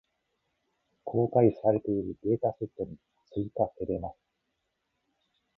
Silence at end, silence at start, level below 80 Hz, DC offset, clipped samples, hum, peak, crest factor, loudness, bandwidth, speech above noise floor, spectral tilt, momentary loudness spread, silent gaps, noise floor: 1.45 s; 1.05 s; -58 dBFS; under 0.1%; under 0.1%; none; -10 dBFS; 20 dB; -30 LUFS; 5.4 kHz; 52 dB; -12.5 dB/octave; 15 LU; none; -80 dBFS